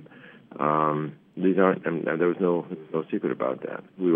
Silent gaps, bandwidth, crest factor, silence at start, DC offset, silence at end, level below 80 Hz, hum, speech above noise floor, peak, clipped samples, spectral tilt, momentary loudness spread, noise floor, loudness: none; 3.7 kHz; 20 dB; 0 s; under 0.1%; 0 s; -80 dBFS; none; 24 dB; -6 dBFS; under 0.1%; -11 dB/octave; 11 LU; -49 dBFS; -26 LUFS